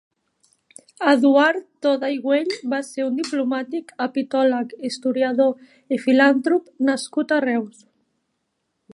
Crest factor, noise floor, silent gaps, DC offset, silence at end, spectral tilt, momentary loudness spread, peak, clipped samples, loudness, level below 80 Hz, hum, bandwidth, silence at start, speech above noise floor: 20 dB; -74 dBFS; none; under 0.1%; 1.25 s; -4 dB/octave; 10 LU; -2 dBFS; under 0.1%; -21 LUFS; -78 dBFS; none; 11.5 kHz; 1 s; 54 dB